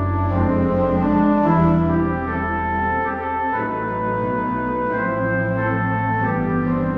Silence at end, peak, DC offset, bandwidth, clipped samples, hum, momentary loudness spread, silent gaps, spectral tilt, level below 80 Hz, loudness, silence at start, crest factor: 0 s; -4 dBFS; under 0.1%; 5 kHz; under 0.1%; none; 6 LU; none; -10.5 dB/octave; -36 dBFS; -20 LUFS; 0 s; 14 dB